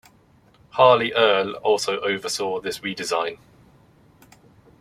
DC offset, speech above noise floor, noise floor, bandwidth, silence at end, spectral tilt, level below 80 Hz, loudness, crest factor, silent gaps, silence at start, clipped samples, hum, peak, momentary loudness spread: under 0.1%; 35 dB; -56 dBFS; 15.5 kHz; 1.45 s; -3 dB/octave; -64 dBFS; -21 LUFS; 22 dB; none; 0.75 s; under 0.1%; none; -2 dBFS; 12 LU